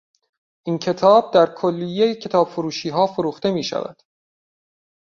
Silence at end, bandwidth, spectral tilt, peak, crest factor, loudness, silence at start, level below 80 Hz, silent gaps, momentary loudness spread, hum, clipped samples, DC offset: 1.15 s; 7.4 kHz; -6 dB/octave; -2 dBFS; 18 dB; -19 LUFS; 0.65 s; -64 dBFS; none; 12 LU; none; under 0.1%; under 0.1%